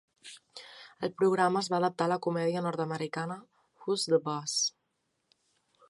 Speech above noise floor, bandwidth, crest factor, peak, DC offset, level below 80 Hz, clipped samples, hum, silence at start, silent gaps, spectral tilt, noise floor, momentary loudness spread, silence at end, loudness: 49 dB; 11.5 kHz; 20 dB; -12 dBFS; under 0.1%; -80 dBFS; under 0.1%; none; 0.25 s; none; -4 dB/octave; -79 dBFS; 20 LU; 1.2 s; -30 LUFS